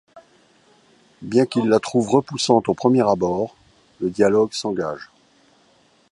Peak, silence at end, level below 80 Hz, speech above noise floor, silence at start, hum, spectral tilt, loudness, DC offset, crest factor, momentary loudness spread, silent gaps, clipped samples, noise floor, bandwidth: -2 dBFS; 1.05 s; -58 dBFS; 39 dB; 0.15 s; none; -5.5 dB/octave; -20 LUFS; under 0.1%; 20 dB; 11 LU; none; under 0.1%; -58 dBFS; 11.5 kHz